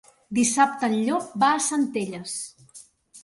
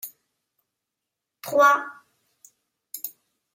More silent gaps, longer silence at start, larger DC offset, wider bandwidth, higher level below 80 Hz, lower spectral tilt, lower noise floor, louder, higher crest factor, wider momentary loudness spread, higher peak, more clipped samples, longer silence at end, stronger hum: neither; first, 0.3 s vs 0.05 s; neither; second, 11.5 kHz vs 16.5 kHz; first, -68 dBFS vs -84 dBFS; about the same, -3 dB/octave vs -2 dB/octave; second, -51 dBFS vs -84 dBFS; about the same, -24 LUFS vs -22 LUFS; about the same, 20 dB vs 22 dB; second, 12 LU vs 22 LU; about the same, -6 dBFS vs -6 dBFS; neither; second, 0.05 s vs 0.45 s; neither